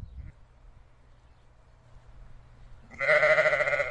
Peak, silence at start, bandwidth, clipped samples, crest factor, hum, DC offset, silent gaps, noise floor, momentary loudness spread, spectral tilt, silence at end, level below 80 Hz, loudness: -10 dBFS; 0 s; 9.6 kHz; under 0.1%; 20 dB; none; under 0.1%; none; -56 dBFS; 26 LU; -3.5 dB/octave; 0 s; -52 dBFS; -23 LUFS